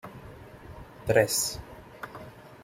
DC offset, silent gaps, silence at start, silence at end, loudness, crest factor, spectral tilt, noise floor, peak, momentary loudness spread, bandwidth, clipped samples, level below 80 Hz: under 0.1%; none; 0.05 s; 0 s; -26 LUFS; 24 dB; -3 dB/octave; -46 dBFS; -8 dBFS; 24 LU; 16.5 kHz; under 0.1%; -54 dBFS